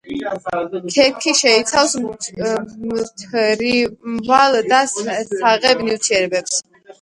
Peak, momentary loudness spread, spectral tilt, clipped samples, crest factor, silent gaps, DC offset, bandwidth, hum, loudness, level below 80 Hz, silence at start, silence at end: 0 dBFS; 11 LU; -2 dB/octave; under 0.1%; 18 dB; none; under 0.1%; 11.5 kHz; none; -17 LUFS; -56 dBFS; 0.05 s; 0.1 s